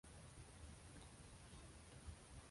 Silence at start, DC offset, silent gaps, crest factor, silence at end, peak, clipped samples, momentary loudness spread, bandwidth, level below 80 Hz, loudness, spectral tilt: 0.05 s; under 0.1%; none; 16 dB; 0 s; -44 dBFS; under 0.1%; 2 LU; 11.5 kHz; -64 dBFS; -60 LUFS; -4 dB/octave